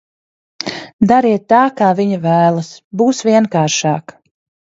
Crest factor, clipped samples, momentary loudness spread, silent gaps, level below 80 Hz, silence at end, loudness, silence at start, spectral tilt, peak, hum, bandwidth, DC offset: 14 dB; under 0.1%; 12 LU; 0.93-0.99 s, 2.84-2.91 s; -54 dBFS; 0.75 s; -14 LUFS; 0.65 s; -5.5 dB/octave; 0 dBFS; none; 7.8 kHz; under 0.1%